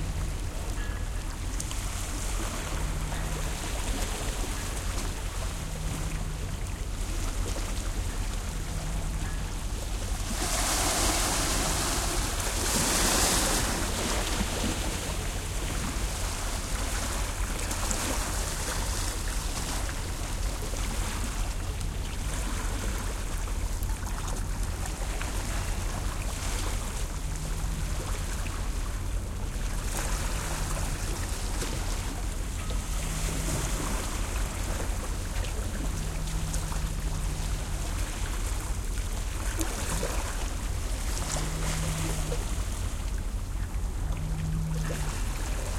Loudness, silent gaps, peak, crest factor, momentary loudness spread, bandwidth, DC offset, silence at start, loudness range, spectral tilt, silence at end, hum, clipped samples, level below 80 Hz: -32 LUFS; none; -10 dBFS; 20 dB; 8 LU; 16.5 kHz; under 0.1%; 0 s; 7 LU; -3.5 dB/octave; 0 s; none; under 0.1%; -32 dBFS